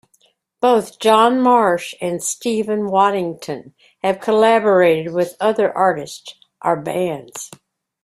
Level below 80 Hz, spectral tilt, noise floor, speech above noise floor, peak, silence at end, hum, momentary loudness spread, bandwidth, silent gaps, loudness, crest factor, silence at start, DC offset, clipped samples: -64 dBFS; -4.5 dB/octave; -60 dBFS; 43 dB; 0 dBFS; 0.55 s; none; 16 LU; 15.5 kHz; none; -17 LUFS; 16 dB; 0.6 s; under 0.1%; under 0.1%